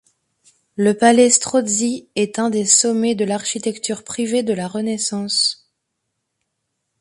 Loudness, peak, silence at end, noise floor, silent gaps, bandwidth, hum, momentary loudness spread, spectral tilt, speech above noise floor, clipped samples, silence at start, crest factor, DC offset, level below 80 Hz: -17 LUFS; 0 dBFS; 1.45 s; -75 dBFS; none; 11.5 kHz; none; 10 LU; -2.5 dB/octave; 58 dB; under 0.1%; 0.8 s; 20 dB; under 0.1%; -64 dBFS